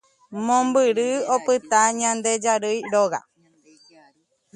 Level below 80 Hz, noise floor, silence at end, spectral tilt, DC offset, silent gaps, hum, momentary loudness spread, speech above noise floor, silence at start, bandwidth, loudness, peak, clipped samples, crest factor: -72 dBFS; -61 dBFS; 1.35 s; -2.5 dB/octave; under 0.1%; none; none; 6 LU; 40 dB; 0.3 s; 11 kHz; -21 LUFS; -4 dBFS; under 0.1%; 18 dB